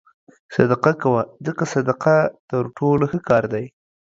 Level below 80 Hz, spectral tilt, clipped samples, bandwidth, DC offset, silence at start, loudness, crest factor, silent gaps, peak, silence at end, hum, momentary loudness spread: -54 dBFS; -7.5 dB/octave; under 0.1%; 7.8 kHz; under 0.1%; 0.5 s; -20 LUFS; 20 dB; 2.40-2.48 s; 0 dBFS; 0.5 s; none; 9 LU